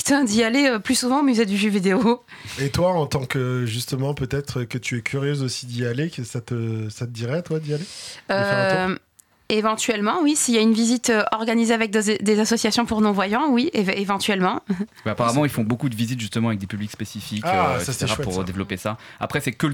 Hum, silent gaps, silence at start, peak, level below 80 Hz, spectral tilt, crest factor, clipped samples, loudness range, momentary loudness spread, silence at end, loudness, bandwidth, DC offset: none; none; 0 s; -8 dBFS; -52 dBFS; -4.5 dB/octave; 14 dB; under 0.1%; 6 LU; 10 LU; 0 s; -22 LUFS; 18 kHz; under 0.1%